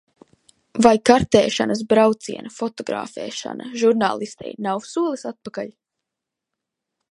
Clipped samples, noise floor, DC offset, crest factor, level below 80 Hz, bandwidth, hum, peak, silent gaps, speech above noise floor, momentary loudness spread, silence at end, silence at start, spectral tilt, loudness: under 0.1%; -84 dBFS; under 0.1%; 20 dB; -52 dBFS; 11.5 kHz; none; 0 dBFS; none; 64 dB; 16 LU; 1.4 s; 0.75 s; -4.5 dB/octave; -20 LUFS